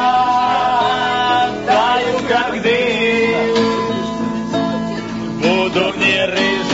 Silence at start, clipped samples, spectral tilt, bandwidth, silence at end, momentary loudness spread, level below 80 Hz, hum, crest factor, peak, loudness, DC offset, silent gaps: 0 s; under 0.1%; -2 dB/octave; 8 kHz; 0 s; 6 LU; -46 dBFS; none; 14 dB; -2 dBFS; -16 LUFS; under 0.1%; none